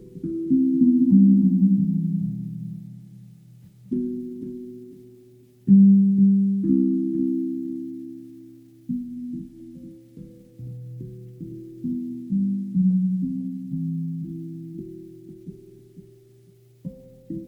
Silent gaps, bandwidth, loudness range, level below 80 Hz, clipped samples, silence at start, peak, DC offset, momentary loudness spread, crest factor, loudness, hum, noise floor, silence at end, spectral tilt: none; 0.6 kHz; 16 LU; -60 dBFS; under 0.1%; 0 s; -6 dBFS; under 0.1%; 25 LU; 18 dB; -21 LUFS; none; -53 dBFS; 0 s; -12.5 dB/octave